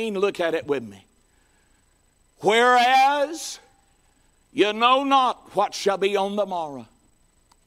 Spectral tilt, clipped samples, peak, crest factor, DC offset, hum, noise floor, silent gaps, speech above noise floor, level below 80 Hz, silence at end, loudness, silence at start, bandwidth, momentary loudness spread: -3 dB/octave; under 0.1%; -4 dBFS; 18 dB; under 0.1%; none; -62 dBFS; none; 41 dB; -64 dBFS; 0.8 s; -21 LUFS; 0 s; 16 kHz; 18 LU